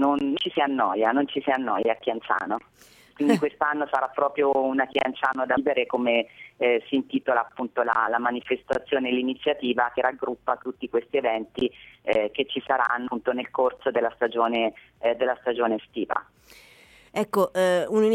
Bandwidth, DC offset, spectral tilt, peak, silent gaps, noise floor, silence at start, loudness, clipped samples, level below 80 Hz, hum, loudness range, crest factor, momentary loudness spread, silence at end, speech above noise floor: 16 kHz; under 0.1%; -5 dB/octave; -6 dBFS; none; -53 dBFS; 0 s; -25 LUFS; under 0.1%; -64 dBFS; none; 2 LU; 20 dB; 6 LU; 0 s; 29 dB